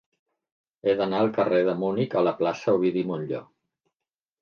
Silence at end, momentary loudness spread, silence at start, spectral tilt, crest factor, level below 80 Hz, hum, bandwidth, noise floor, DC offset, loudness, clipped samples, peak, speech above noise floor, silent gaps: 1 s; 7 LU; 0.85 s; -7.5 dB/octave; 16 dB; -70 dBFS; none; 7 kHz; -90 dBFS; under 0.1%; -25 LUFS; under 0.1%; -10 dBFS; 66 dB; none